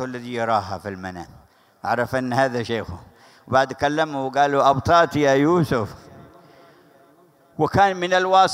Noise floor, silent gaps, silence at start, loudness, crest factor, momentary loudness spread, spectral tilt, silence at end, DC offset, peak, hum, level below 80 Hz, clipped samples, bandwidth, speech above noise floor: -55 dBFS; none; 0 s; -20 LUFS; 18 dB; 16 LU; -5.5 dB/octave; 0 s; under 0.1%; -2 dBFS; none; -52 dBFS; under 0.1%; 16 kHz; 35 dB